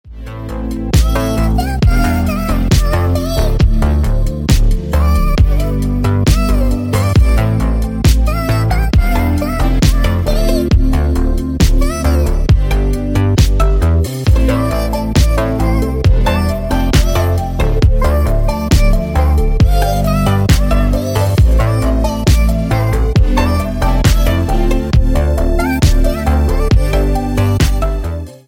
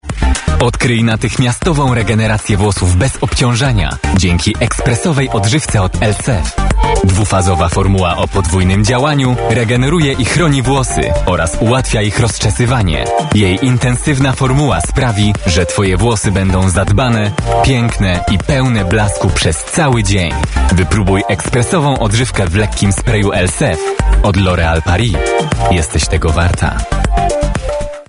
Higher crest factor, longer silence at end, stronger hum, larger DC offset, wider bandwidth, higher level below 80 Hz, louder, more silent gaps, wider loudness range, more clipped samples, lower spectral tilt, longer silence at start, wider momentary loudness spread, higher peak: about the same, 10 dB vs 12 dB; about the same, 0.1 s vs 0.05 s; neither; neither; first, 17 kHz vs 11 kHz; first, -14 dBFS vs -20 dBFS; about the same, -14 LUFS vs -12 LUFS; neither; about the same, 1 LU vs 1 LU; neither; first, -6.5 dB/octave vs -5 dB/octave; about the same, 0.05 s vs 0.05 s; about the same, 4 LU vs 3 LU; about the same, 0 dBFS vs 0 dBFS